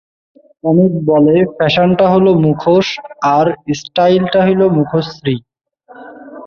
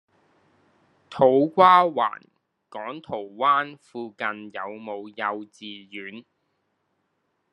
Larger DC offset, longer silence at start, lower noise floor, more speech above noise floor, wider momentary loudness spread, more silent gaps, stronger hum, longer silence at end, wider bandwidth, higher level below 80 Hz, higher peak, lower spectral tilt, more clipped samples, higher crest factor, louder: neither; second, 0.65 s vs 1.1 s; second, -43 dBFS vs -74 dBFS; second, 31 dB vs 51 dB; second, 10 LU vs 23 LU; neither; neither; second, 0 s vs 1.35 s; second, 7 kHz vs 10 kHz; first, -48 dBFS vs -76 dBFS; about the same, 0 dBFS vs -2 dBFS; about the same, -7 dB/octave vs -6.5 dB/octave; neither; second, 12 dB vs 22 dB; first, -12 LUFS vs -22 LUFS